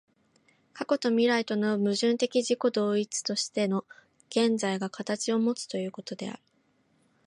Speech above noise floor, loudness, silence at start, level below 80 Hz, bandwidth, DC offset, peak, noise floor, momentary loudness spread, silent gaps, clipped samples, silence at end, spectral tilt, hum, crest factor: 41 dB; -28 LUFS; 0.75 s; -80 dBFS; 11.5 kHz; under 0.1%; -12 dBFS; -69 dBFS; 12 LU; none; under 0.1%; 0.9 s; -4 dB/octave; none; 16 dB